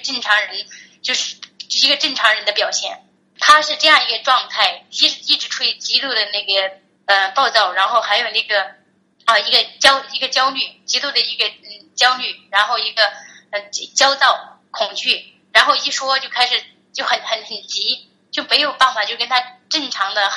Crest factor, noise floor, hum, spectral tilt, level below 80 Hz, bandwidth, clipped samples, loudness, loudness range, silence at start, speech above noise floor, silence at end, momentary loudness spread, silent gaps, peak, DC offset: 18 dB; -56 dBFS; none; 1.5 dB/octave; -66 dBFS; 11.5 kHz; under 0.1%; -16 LUFS; 3 LU; 0 s; 38 dB; 0 s; 12 LU; none; 0 dBFS; under 0.1%